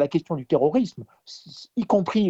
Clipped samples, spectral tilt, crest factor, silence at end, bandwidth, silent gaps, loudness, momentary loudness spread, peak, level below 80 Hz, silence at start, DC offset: under 0.1%; -7.5 dB/octave; 16 dB; 0 s; 8 kHz; none; -24 LUFS; 21 LU; -8 dBFS; -64 dBFS; 0 s; under 0.1%